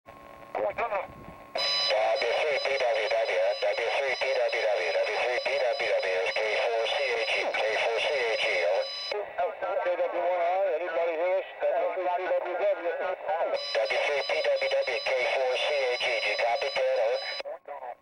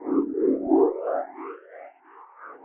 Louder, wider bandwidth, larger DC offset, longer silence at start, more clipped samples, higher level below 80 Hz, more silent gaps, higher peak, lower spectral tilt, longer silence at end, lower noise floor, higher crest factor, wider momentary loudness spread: second, -27 LUFS vs -24 LUFS; first, 10.5 kHz vs 2.9 kHz; neither; about the same, 0.1 s vs 0 s; neither; about the same, -68 dBFS vs -66 dBFS; neither; second, -16 dBFS vs -8 dBFS; second, -1.5 dB/octave vs -11.5 dB/octave; about the same, 0.05 s vs 0.05 s; about the same, -48 dBFS vs -50 dBFS; second, 12 dB vs 18 dB; second, 5 LU vs 24 LU